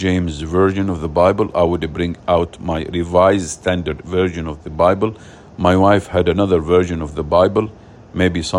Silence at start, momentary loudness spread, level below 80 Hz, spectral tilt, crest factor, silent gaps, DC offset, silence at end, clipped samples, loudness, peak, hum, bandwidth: 0 s; 9 LU; -40 dBFS; -6.5 dB/octave; 16 dB; none; under 0.1%; 0 s; under 0.1%; -17 LUFS; 0 dBFS; none; 11.5 kHz